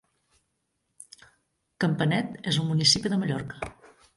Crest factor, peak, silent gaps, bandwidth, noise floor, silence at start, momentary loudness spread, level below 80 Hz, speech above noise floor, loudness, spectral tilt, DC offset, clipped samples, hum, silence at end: 22 dB; -8 dBFS; none; 11.5 kHz; -77 dBFS; 1.8 s; 16 LU; -58 dBFS; 52 dB; -25 LUFS; -4 dB/octave; under 0.1%; under 0.1%; none; 0.45 s